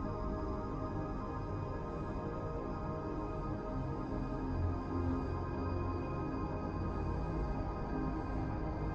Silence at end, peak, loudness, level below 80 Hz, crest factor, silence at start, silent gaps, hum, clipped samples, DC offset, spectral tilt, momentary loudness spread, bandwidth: 0 s; -24 dBFS; -39 LUFS; -44 dBFS; 14 dB; 0 s; none; none; under 0.1%; under 0.1%; -9.5 dB/octave; 3 LU; 7.4 kHz